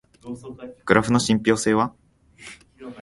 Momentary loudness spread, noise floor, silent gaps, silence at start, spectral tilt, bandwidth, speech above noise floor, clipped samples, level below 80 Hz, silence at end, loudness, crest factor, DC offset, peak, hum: 23 LU; -46 dBFS; none; 0.25 s; -5 dB/octave; 11.5 kHz; 25 dB; under 0.1%; -52 dBFS; 0 s; -20 LUFS; 22 dB; under 0.1%; -2 dBFS; none